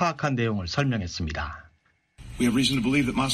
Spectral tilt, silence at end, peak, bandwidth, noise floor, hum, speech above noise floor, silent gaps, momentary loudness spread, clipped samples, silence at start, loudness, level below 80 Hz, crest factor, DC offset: -5 dB/octave; 0 s; -10 dBFS; 13.5 kHz; -66 dBFS; none; 41 dB; none; 12 LU; under 0.1%; 0 s; -26 LUFS; -44 dBFS; 16 dB; under 0.1%